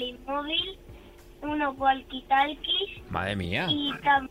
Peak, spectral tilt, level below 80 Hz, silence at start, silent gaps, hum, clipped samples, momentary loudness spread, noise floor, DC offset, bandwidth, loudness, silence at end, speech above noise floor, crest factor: -12 dBFS; -5.5 dB/octave; -52 dBFS; 0 s; none; none; under 0.1%; 9 LU; -49 dBFS; under 0.1%; 15.5 kHz; -27 LUFS; 0.05 s; 21 dB; 18 dB